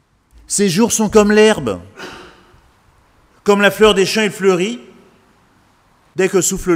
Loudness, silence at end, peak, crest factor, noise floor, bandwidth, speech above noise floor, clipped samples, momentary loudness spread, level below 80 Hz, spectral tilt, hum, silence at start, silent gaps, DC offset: -14 LUFS; 0 s; 0 dBFS; 16 dB; -53 dBFS; 16.5 kHz; 40 dB; under 0.1%; 18 LU; -42 dBFS; -3.5 dB/octave; none; 0.5 s; none; under 0.1%